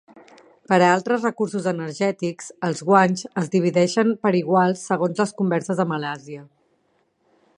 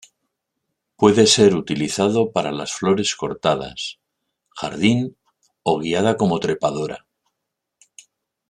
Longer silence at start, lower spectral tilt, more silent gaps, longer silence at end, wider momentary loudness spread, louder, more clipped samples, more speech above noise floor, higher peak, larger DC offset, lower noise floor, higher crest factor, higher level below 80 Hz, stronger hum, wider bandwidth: second, 0.15 s vs 1 s; first, -6 dB/octave vs -4.5 dB/octave; neither; second, 1.15 s vs 1.5 s; second, 11 LU vs 16 LU; about the same, -21 LUFS vs -19 LUFS; neither; second, 46 dB vs 61 dB; about the same, -2 dBFS vs -2 dBFS; neither; second, -66 dBFS vs -80 dBFS; about the same, 20 dB vs 18 dB; second, -70 dBFS vs -56 dBFS; neither; about the same, 11 kHz vs 12 kHz